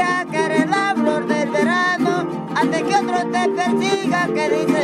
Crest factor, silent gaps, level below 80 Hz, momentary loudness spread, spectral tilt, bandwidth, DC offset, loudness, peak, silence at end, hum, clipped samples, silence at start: 14 dB; none; -62 dBFS; 3 LU; -5 dB/octave; 13 kHz; under 0.1%; -18 LUFS; -4 dBFS; 0 s; none; under 0.1%; 0 s